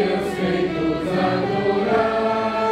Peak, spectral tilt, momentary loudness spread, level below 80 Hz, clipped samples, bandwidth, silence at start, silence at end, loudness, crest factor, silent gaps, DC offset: -6 dBFS; -6.5 dB/octave; 3 LU; -46 dBFS; under 0.1%; 14 kHz; 0 s; 0 s; -21 LUFS; 14 dB; none; under 0.1%